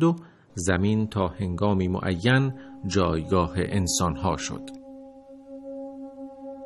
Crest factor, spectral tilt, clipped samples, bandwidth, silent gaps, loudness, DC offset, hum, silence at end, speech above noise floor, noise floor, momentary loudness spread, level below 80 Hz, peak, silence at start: 18 dB; -5.5 dB/octave; under 0.1%; 12.5 kHz; none; -25 LUFS; under 0.1%; none; 0 s; 21 dB; -46 dBFS; 18 LU; -46 dBFS; -8 dBFS; 0 s